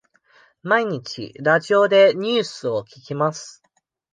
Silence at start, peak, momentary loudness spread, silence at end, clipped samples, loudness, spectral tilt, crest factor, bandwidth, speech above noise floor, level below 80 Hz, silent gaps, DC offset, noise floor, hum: 0.65 s; -2 dBFS; 18 LU; 0.65 s; under 0.1%; -19 LUFS; -4.5 dB/octave; 18 dB; 9.4 kHz; 37 dB; -70 dBFS; none; under 0.1%; -56 dBFS; none